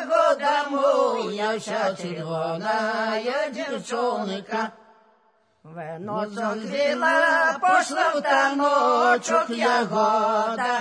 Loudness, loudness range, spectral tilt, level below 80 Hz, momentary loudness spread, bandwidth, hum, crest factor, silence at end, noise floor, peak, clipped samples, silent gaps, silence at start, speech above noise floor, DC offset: -22 LUFS; 9 LU; -4 dB/octave; -80 dBFS; 10 LU; 10.5 kHz; none; 16 dB; 0 s; -63 dBFS; -6 dBFS; under 0.1%; none; 0 s; 40 dB; under 0.1%